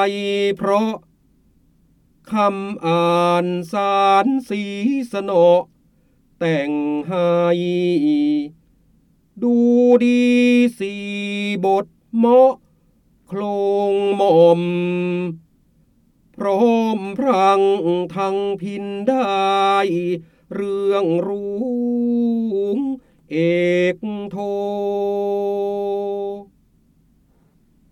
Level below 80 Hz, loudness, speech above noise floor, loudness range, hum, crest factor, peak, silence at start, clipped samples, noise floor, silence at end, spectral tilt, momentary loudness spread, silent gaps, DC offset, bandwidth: -62 dBFS; -18 LUFS; 40 dB; 4 LU; none; 16 dB; -2 dBFS; 0 s; under 0.1%; -57 dBFS; 1.5 s; -7 dB/octave; 12 LU; none; under 0.1%; 12.5 kHz